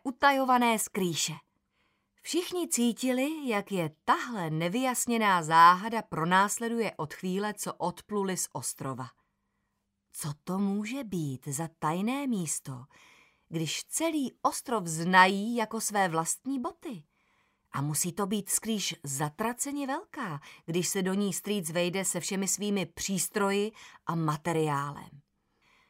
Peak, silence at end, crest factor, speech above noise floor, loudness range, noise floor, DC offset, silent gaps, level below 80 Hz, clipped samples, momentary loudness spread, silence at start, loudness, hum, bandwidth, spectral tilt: -8 dBFS; 0.7 s; 22 dB; 50 dB; 9 LU; -80 dBFS; under 0.1%; none; -70 dBFS; under 0.1%; 13 LU; 0.05 s; -29 LUFS; none; 16 kHz; -3.5 dB/octave